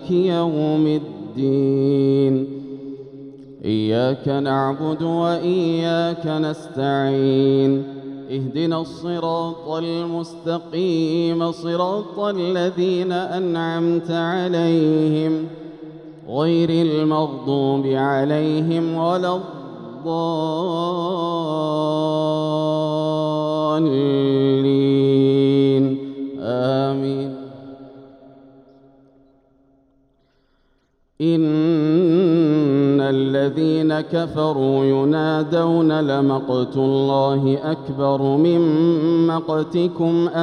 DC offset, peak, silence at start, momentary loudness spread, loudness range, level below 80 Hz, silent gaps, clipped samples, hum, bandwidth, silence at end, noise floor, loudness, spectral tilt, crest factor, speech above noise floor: under 0.1%; -6 dBFS; 0 s; 10 LU; 5 LU; -62 dBFS; none; under 0.1%; none; 9.8 kHz; 0 s; -63 dBFS; -19 LUFS; -8 dB/octave; 12 dB; 44 dB